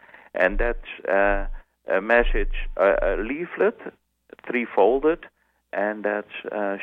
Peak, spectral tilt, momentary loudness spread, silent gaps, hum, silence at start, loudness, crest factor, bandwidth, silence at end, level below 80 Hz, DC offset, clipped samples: -4 dBFS; -7.5 dB/octave; 13 LU; none; none; 0.35 s; -23 LUFS; 20 dB; 4.1 kHz; 0 s; -32 dBFS; under 0.1%; under 0.1%